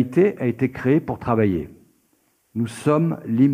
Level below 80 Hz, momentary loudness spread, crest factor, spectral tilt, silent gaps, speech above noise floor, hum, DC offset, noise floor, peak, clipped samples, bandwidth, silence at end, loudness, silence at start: -54 dBFS; 9 LU; 16 dB; -8.5 dB/octave; none; 45 dB; none; under 0.1%; -64 dBFS; -6 dBFS; under 0.1%; 15 kHz; 0 s; -21 LUFS; 0 s